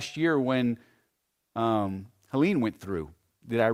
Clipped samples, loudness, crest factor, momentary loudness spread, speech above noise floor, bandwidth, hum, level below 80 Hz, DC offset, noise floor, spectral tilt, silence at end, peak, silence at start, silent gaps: under 0.1%; -28 LUFS; 20 dB; 14 LU; 51 dB; 15 kHz; none; -60 dBFS; under 0.1%; -78 dBFS; -6.5 dB/octave; 0 s; -10 dBFS; 0 s; none